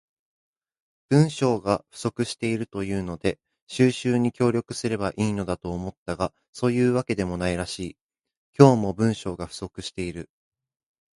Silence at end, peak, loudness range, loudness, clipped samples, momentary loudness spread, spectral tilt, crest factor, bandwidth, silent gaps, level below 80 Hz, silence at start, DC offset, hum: 0.95 s; 0 dBFS; 3 LU; -25 LUFS; under 0.1%; 13 LU; -6.5 dB/octave; 24 dB; 11.5 kHz; 3.62-3.67 s, 5.97-6.06 s, 6.48-6.53 s, 8.01-8.09 s, 8.37-8.53 s; -50 dBFS; 1.1 s; under 0.1%; none